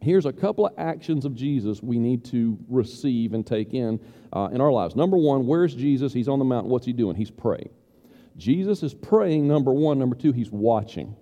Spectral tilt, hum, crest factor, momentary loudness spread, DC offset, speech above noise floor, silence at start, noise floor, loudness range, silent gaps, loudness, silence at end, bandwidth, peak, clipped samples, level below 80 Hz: -9 dB/octave; none; 16 dB; 7 LU; under 0.1%; 30 dB; 0 s; -53 dBFS; 3 LU; none; -24 LUFS; 0.05 s; 9.8 kHz; -6 dBFS; under 0.1%; -60 dBFS